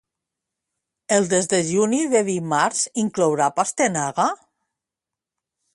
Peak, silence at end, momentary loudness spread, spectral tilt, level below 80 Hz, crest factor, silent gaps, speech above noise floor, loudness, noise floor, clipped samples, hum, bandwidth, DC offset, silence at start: -4 dBFS; 1.4 s; 4 LU; -4 dB/octave; -66 dBFS; 18 dB; none; 67 dB; -20 LUFS; -87 dBFS; under 0.1%; none; 11.5 kHz; under 0.1%; 1.1 s